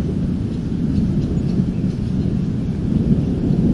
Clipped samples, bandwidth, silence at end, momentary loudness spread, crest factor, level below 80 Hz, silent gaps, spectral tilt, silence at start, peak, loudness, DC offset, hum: under 0.1%; 11 kHz; 0 s; 4 LU; 14 dB; -30 dBFS; none; -9.5 dB/octave; 0 s; -4 dBFS; -20 LUFS; 0.3%; none